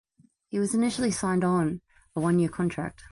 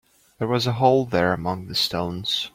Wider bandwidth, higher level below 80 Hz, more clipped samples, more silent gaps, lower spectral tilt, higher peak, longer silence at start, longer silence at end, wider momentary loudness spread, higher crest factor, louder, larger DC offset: second, 11.5 kHz vs 16.5 kHz; about the same, -56 dBFS vs -54 dBFS; neither; neither; about the same, -6 dB/octave vs -5 dB/octave; second, -14 dBFS vs -4 dBFS; about the same, 0.5 s vs 0.4 s; about the same, 0.05 s vs 0.05 s; about the same, 10 LU vs 8 LU; second, 12 dB vs 18 dB; second, -27 LUFS vs -22 LUFS; neither